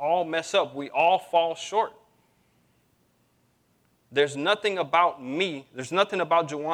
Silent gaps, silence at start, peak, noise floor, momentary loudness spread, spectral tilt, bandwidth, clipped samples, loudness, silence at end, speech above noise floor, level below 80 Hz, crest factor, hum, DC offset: none; 0 s; -6 dBFS; -67 dBFS; 7 LU; -3.5 dB/octave; 13 kHz; under 0.1%; -25 LUFS; 0 s; 42 dB; -78 dBFS; 20 dB; none; under 0.1%